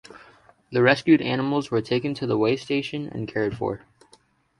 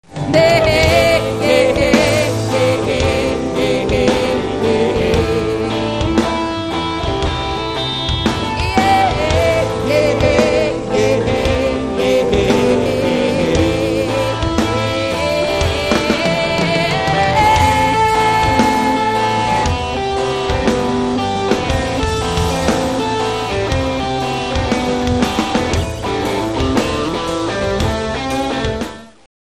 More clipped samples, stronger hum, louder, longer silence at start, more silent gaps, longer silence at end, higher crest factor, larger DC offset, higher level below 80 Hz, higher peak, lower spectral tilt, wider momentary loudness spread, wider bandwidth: neither; neither; second, -23 LUFS vs -15 LUFS; about the same, 0.1 s vs 0.1 s; neither; first, 0.8 s vs 0.4 s; first, 22 dB vs 16 dB; second, under 0.1% vs 0.3%; second, -60 dBFS vs -28 dBFS; about the same, -2 dBFS vs 0 dBFS; first, -6.5 dB/octave vs -5 dB/octave; first, 11 LU vs 6 LU; second, 11.5 kHz vs 13.5 kHz